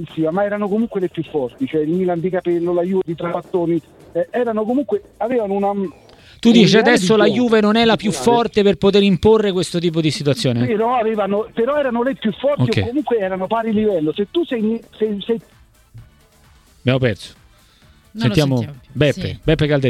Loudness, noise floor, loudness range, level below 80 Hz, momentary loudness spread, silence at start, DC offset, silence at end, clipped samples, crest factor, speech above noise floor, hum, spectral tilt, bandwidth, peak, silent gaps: -17 LUFS; -50 dBFS; 8 LU; -44 dBFS; 9 LU; 0 s; under 0.1%; 0 s; under 0.1%; 18 dB; 33 dB; none; -6 dB/octave; 13.5 kHz; 0 dBFS; none